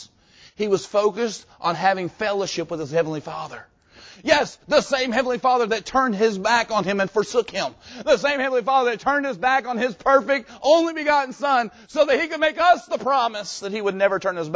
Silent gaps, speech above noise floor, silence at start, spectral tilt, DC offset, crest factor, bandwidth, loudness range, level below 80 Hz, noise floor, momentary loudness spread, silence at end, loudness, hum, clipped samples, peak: none; 31 dB; 0 s; -4 dB/octave; under 0.1%; 18 dB; 8 kHz; 4 LU; -58 dBFS; -52 dBFS; 9 LU; 0 s; -21 LUFS; none; under 0.1%; -4 dBFS